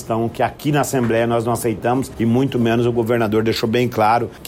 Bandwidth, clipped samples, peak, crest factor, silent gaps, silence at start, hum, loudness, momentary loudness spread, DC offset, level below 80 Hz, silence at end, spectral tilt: 16.5 kHz; under 0.1%; -6 dBFS; 12 dB; none; 0 s; none; -18 LUFS; 4 LU; under 0.1%; -46 dBFS; 0 s; -6 dB/octave